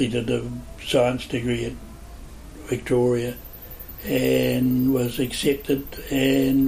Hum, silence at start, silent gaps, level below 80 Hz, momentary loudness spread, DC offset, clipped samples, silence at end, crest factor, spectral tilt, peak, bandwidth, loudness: none; 0 s; none; -42 dBFS; 20 LU; under 0.1%; under 0.1%; 0 s; 16 dB; -5.5 dB/octave; -8 dBFS; 15.5 kHz; -23 LUFS